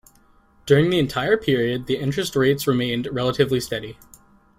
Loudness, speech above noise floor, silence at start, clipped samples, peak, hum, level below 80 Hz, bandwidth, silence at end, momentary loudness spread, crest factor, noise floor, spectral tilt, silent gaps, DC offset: -21 LUFS; 35 dB; 0.65 s; under 0.1%; -4 dBFS; none; -50 dBFS; 16 kHz; 0.65 s; 9 LU; 18 dB; -56 dBFS; -5.5 dB/octave; none; under 0.1%